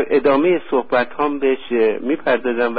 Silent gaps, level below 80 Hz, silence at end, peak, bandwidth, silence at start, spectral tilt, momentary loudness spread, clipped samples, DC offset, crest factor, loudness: none; -54 dBFS; 0 s; -4 dBFS; 4.9 kHz; 0 s; -10.5 dB/octave; 5 LU; under 0.1%; 2%; 12 dB; -18 LUFS